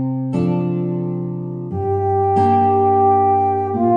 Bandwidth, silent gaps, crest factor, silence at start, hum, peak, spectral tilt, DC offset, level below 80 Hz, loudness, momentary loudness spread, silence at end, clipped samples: 5.4 kHz; none; 12 dB; 0 s; none; -4 dBFS; -10.5 dB/octave; under 0.1%; -56 dBFS; -17 LUFS; 10 LU; 0 s; under 0.1%